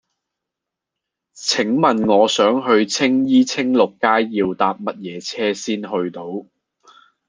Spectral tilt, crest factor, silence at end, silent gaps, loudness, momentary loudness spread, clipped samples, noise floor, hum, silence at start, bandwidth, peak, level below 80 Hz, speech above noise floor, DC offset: -4 dB/octave; 18 dB; 0.85 s; none; -18 LUFS; 12 LU; under 0.1%; -83 dBFS; none; 1.35 s; 10 kHz; -2 dBFS; -62 dBFS; 66 dB; under 0.1%